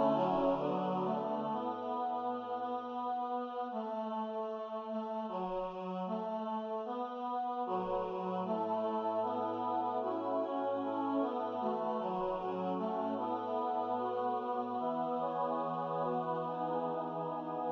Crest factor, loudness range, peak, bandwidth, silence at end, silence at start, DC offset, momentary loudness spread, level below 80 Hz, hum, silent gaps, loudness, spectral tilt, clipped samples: 16 dB; 3 LU; -20 dBFS; 6.8 kHz; 0 s; 0 s; under 0.1%; 4 LU; -72 dBFS; none; none; -37 LUFS; -6 dB/octave; under 0.1%